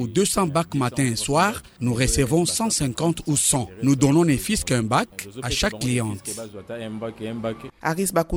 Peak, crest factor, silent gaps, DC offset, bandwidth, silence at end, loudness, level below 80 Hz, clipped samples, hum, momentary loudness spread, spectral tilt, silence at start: -2 dBFS; 20 dB; none; under 0.1%; over 20 kHz; 0 s; -22 LUFS; -40 dBFS; under 0.1%; none; 12 LU; -4.5 dB/octave; 0 s